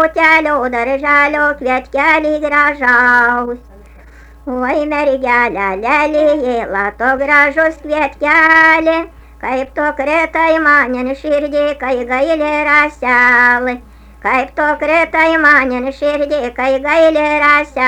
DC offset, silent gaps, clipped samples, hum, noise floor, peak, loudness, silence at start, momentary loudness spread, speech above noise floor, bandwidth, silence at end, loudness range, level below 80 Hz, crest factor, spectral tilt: under 0.1%; none; under 0.1%; none; -38 dBFS; 0 dBFS; -12 LUFS; 0 s; 9 LU; 26 dB; 12.5 kHz; 0 s; 3 LU; -40 dBFS; 12 dB; -4.5 dB/octave